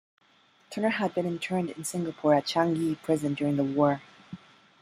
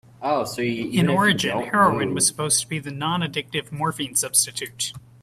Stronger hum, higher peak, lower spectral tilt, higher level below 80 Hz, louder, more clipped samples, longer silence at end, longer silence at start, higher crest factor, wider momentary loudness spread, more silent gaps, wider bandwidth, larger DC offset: neither; second, -10 dBFS vs -4 dBFS; first, -5.5 dB/octave vs -3 dB/octave; second, -70 dBFS vs -58 dBFS; second, -28 LUFS vs -22 LUFS; neither; first, 0.45 s vs 0.25 s; first, 0.7 s vs 0.2 s; about the same, 18 dB vs 20 dB; first, 16 LU vs 9 LU; neither; about the same, 15 kHz vs 16 kHz; neither